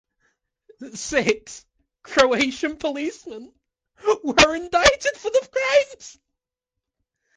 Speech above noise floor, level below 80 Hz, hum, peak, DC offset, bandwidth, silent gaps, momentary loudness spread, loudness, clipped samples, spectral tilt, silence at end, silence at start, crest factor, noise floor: 63 dB; -48 dBFS; none; 0 dBFS; under 0.1%; 10 kHz; none; 22 LU; -20 LUFS; under 0.1%; -2.5 dB/octave; 1.25 s; 0.8 s; 22 dB; -85 dBFS